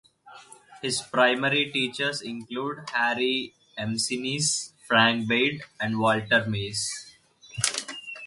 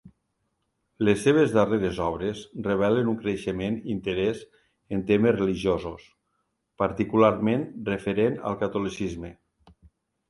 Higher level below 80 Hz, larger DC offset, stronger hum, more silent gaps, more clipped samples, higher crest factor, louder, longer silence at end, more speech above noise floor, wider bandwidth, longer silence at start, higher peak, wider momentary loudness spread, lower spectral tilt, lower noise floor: second, -62 dBFS vs -52 dBFS; neither; neither; neither; neither; about the same, 26 dB vs 22 dB; about the same, -25 LUFS vs -25 LUFS; second, 0 s vs 0.95 s; second, 24 dB vs 51 dB; about the same, 11.5 kHz vs 11.5 kHz; first, 0.25 s vs 0.05 s; about the same, -2 dBFS vs -4 dBFS; about the same, 13 LU vs 12 LU; second, -3 dB/octave vs -7 dB/octave; second, -50 dBFS vs -76 dBFS